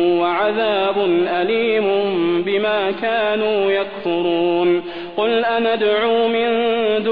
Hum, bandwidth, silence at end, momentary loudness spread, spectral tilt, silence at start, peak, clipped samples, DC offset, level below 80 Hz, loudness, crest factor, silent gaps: none; 5 kHz; 0 s; 3 LU; -8 dB/octave; 0 s; -6 dBFS; under 0.1%; 0.5%; -58 dBFS; -18 LUFS; 12 dB; none